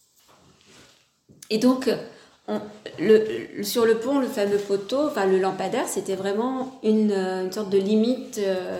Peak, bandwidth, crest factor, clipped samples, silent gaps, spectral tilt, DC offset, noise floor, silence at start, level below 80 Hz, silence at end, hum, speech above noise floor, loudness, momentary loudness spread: -6 dBFS; 16.5 kHz; 18 dB; under 0.1%; none; -5 dB/octave; under 0.1%; -57 dBFS; 1.5 s; -70 dBFS; 0 s; none; 34 dB; -24 LUFS; 10 LU